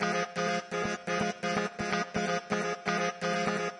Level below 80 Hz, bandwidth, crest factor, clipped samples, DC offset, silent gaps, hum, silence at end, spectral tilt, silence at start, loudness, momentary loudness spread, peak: -64 dBFS; 11.5 kHz; 16 dB; under 0.1%; under 0.1%; none; none; 0 s; -4 dB/octave; 0 s; -31 LUFS; 2 LU; -16 dBFS